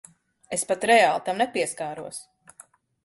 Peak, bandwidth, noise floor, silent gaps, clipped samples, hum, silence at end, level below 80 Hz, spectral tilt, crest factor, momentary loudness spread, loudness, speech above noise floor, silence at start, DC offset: -6 dBFS; 12 kHz; -54 dBFS; none; under 0.1%; none; 0.8 s; -70 dBFS; -2.5 dB/octave; 20 dB; 18 LU; -23 LUFS; 30 dB; 0.5 s; under 0.1%